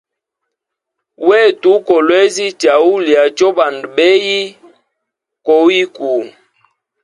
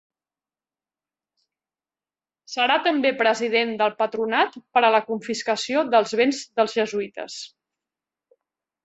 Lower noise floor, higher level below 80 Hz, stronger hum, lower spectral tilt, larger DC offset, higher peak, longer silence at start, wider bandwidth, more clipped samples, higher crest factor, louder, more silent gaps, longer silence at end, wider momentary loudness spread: second, -78 dBFS vs under -90 dBFS; first, -64 dBFS vs -72 dBFS; neither; about the same, -3 dB/octave vs -3 dB/octave; neither; first, 0 dBFS vs -4 dBFS; second, 1.2 s vs 2.5 s; first, 11.5 kHz vs 8.2 kHz; neither; second, 14 dB vs 20 dB; first, -11 LUFS vs -22 LUFS; neither; second, 0.75 s vs 1.4 s; second, 8 LU vs 12 LU